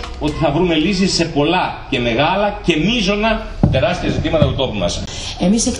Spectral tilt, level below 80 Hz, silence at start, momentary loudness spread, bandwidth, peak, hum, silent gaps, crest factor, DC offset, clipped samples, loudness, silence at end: -5 dB/octave; -30 dBFS; 0 s; 5 LU; 11 kHz; 0 dBFS; none; none; 16 dB; under 0.1%; under 0.1%; -16 LUFS; 0 s